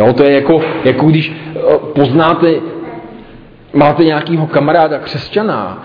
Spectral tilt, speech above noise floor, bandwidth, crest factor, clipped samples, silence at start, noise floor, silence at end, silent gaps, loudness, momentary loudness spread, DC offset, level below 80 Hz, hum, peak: -9.5 dB/octave; 26 dB; 5.2 kHz; 12 dB; 0.2%; 0 s; -36 dBFS; 0 s; none; -11 LUFS; 10 LU; under 0.1%; -46 dBFS; none; 0 dBFS